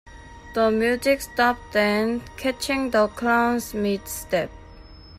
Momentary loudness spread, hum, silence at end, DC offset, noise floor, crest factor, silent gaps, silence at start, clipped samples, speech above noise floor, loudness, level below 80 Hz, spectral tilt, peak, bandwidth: 6 LU; none; 0 s; under 0.1%; -44 dBFS; 16 dB; none; 0.05 s; under 0.1%; 21 dB; -23 LUFS; -48 dBFS; -4 dB/octave; -8 dBFS; 15.5 kHz